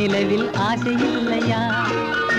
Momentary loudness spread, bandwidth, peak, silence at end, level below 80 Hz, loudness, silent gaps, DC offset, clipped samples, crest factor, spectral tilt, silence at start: 1 LU; 10.5 kHz; -8 dBFS; 0 s; -50 dBFS; -20 LUFS; none; under 0.1%; under 0.1%; 12 dB; -5.5 dB/octave; 0 s